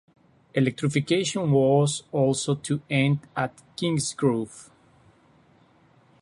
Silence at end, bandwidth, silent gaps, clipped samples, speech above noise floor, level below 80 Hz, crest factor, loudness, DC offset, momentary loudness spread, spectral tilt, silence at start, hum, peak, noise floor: 1.6 s; 11.5 kHz; none; under 0.1%; 35 dB; -62 dBFS; 18 dB; -25 LUFS; under 0.1%; 9 LU; -5.5 dB/octave; 0.55 s; none; -8 dBFS; -59 dBFS